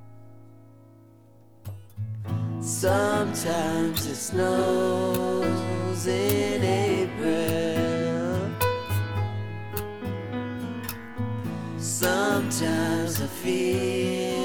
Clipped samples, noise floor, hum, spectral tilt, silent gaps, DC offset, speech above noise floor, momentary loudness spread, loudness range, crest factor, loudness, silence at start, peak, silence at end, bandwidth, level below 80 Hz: under 0.1%; -54 dBFS; none; -5 dB/octave; none; 0.2%; 29 dB; 10 LU; 5 LU; 18 dB; -26 LUFS; 0 s; -8 dBFS; 0 s; over 20 kHz; -54 dBFS